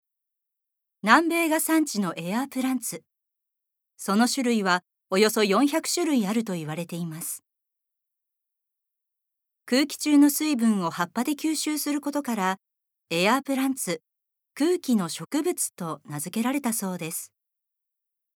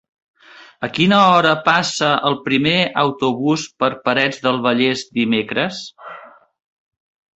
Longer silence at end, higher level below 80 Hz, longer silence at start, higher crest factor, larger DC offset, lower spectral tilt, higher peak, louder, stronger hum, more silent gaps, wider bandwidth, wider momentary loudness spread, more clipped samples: about the same, 1.1 s vs 1.1 s; second, -86 dBFS vs -58 dBFS; first, 1.05 s vs 0.6 s; first, 24 dB vs 18 dB; neither; about the same, -4 dB/octave vs -4.5 dB/octave; about the same, -4 dBFS vs -2 dBFS; second, -25 LUFS vs -16 LUFS; neither; neither; first, 19.5 kHz vs 8.4 kHz; about the same, 13 LU vs 12 LU; neither